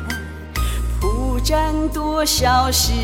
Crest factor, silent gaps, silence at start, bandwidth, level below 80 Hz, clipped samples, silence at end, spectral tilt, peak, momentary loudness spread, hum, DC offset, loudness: 14 dB; none; 0 s; 17 kHz; -24 dBFS; under 0.1%; 0 s; -3.5 dB/octave; -4 dBFS; 11 LU; none; under 0.1%; -19 LUFS